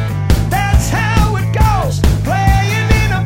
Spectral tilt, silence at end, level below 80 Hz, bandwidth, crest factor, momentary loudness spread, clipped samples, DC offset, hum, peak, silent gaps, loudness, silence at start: -5.5 dB/octave; 0 s; -18 dBFS; 16.5 kHz; 12 dB; 2 LU; under 0.1%; under 0.1%; none; 0 dBFS; none; -14 LUFS; 0 s